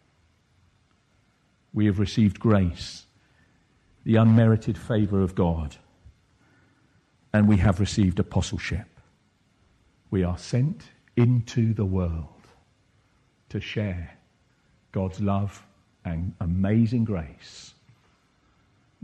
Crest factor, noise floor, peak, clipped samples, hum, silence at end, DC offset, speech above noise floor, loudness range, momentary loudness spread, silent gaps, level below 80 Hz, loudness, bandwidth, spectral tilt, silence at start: 20 dB; -65 dBFS; -6 dBFS; under 0.1%; none; 1.35 s; under 0.1%; 42 dB; 8 LU; 16 LU; none; -44 dBFS; -25 LUFS; 9.2 kHz; -7.5 dB/octave; 1.75 s